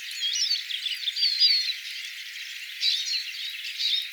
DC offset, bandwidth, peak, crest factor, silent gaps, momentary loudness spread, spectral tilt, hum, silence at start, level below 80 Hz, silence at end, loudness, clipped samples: under 0.1%; over 20 kHz; -10 dBFS; 18 dB; none; 15 LU; 13.5 dB/octave; none; 0 s; under -90 dBFS; 0 s; -25 LUFS; under 0.1%